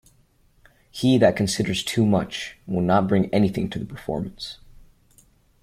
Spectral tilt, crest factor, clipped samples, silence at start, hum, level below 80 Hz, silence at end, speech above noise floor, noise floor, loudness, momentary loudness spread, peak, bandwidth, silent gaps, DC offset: -6 dB/octave; 20 dB; under 0.1%; 0.95 s; none; -50 dBFS; 1.1 s; 38 dB; -59 dBFS; -22 LUFS; 15 LU; -4 dBFS; 15.5 kHz; none; under 0.1%